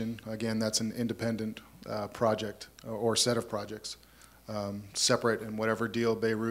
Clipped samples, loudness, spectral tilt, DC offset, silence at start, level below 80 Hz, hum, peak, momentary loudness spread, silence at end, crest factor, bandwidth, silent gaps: under 0.1%; -31 LUFS; -3.5 dB/octave; under 0.1%; 0 s; -64 dBFS; none; -12 dBFS; 14 LU; 0 s; 20 dB; 16 kHz; none